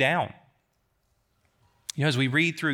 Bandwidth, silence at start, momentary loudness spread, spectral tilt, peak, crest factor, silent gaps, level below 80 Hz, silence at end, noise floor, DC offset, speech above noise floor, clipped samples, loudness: 17.5 kHz; 0 s; 14 LU; -5 dB/octave; -8 dBFS; 20 dB; none; -74 dBFS; 0 s; -72 dBFS; under 0.1%; 48 dB; under 0.1%; -26 LUFS